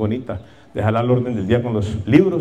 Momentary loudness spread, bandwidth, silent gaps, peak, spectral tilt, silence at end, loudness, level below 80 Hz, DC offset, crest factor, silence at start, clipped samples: 16 LU; 9.2 kHz; none; -2 dBFS; -8.5 dB/octave; 0 s; -19 LUFS; -48 dBFS; 0.3%; 16 dB; 0 s; under 0.1%